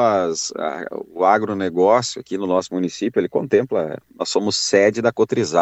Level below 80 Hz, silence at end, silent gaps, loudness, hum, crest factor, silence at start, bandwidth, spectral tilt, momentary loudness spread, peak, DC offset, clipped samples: -64 dBFS; 0 s; none; -19 LUFS; none; 18 dB; 0 s; 8.4 kHz; -4 dB/octave; 10 LU; -2 dBFS; under 0.1%; under 0.1%